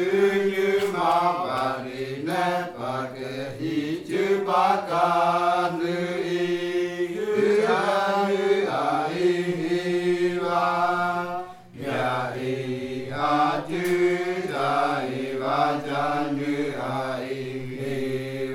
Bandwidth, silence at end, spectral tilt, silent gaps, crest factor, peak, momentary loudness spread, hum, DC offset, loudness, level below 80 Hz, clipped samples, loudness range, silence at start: 16 kHz; 0 s; -6 dB/octave; none; 18 dB; -6 dBFS; 9 LU; none; under 0.1%; -25 LUFS; -64 dBFS; under 0.1%; 3 LU; 0 s